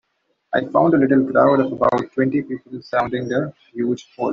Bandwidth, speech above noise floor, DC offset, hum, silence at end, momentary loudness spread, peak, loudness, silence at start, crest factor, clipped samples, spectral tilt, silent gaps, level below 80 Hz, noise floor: 7 kHz; 51 dB; under 0.1%; none; 0 s; 10 LU; -2 dBFS; -19 LUFS; 0.5 s; 16 dB; under 0.1%; -6 dB/octave; none; -56 dBFS; -70 dBFS